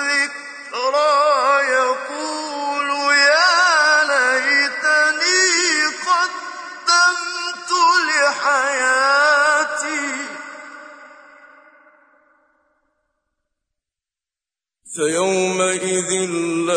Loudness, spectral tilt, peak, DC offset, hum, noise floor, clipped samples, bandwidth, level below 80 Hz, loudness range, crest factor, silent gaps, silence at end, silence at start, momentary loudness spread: -16 LUFS; -1 dB/octave; -4 dBFS; under 0.1%; none; under -90 dBFS; under 0.1%; 10.5 kHz; -76 dBFS; 11 LU; 16 dB; none; 0 s; 0 s; 12 LU